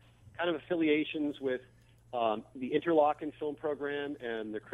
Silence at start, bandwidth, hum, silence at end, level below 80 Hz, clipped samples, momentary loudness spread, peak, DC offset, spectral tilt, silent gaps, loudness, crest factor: 0.25 s; 11 kHz; none; 0 s; -70 dBFS; under 0.1%; 10 LU; -14 dBFS; under 0.1%; -7 dB/octave; none; -33 LUFS; 20 dB